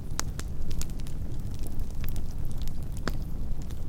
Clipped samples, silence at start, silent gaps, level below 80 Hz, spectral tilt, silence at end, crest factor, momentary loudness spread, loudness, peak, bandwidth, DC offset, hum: under 0.1%; 0 s; none; -32 dBFS; -5 dB/octave; 0 s; 22 dB; 3 LU; -37 LUFS; -4 dBFS; 17 kHz; under 0.1%; none